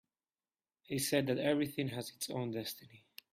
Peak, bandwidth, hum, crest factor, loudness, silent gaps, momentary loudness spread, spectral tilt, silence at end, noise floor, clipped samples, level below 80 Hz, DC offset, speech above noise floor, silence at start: -18 dBFS; 16 kHz; none; 20 dB; -37 LUFS; none; 16 LU; -4.5 dB/octave; 0.35 s; under -90 dBFS; under 0.1%; -76 dBFS; under 0.1%; over 53 dB; 0.9 s